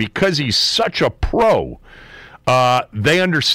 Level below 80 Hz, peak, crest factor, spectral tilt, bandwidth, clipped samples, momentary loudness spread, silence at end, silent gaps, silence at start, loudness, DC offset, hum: -34 dBFS; -6 dBFS; 10 dB; -4 dB/octave; 16 kHz; under 0.1%; 5 LU; 0 s; none; 0 s; -16 LUFS; under 0.1%; none